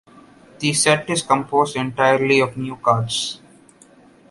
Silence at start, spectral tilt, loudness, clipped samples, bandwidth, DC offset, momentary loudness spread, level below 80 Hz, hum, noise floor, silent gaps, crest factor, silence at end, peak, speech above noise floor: 0.6 s; -3.5 dB/octave; -19 LUFS; under 0.1%; 11.5 kHz; under 0.1%; 8 LU; -58 dBFS; none; -50 dBFS; none; 20 dB; 0.95 s; -2 dBFS; 31 dB